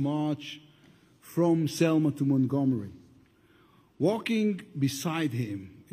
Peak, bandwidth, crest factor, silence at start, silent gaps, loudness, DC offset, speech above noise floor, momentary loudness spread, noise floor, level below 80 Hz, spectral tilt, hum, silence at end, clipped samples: -12 dBFS; 15.5 kHz; 16 dB; 0 s; none; -28 LUFS; under 0.1%; 34 dB; 11 LU; -61 dBFS; -70 dBFS; -6.5 dB/octave; none; 0.1 s; under 0.1%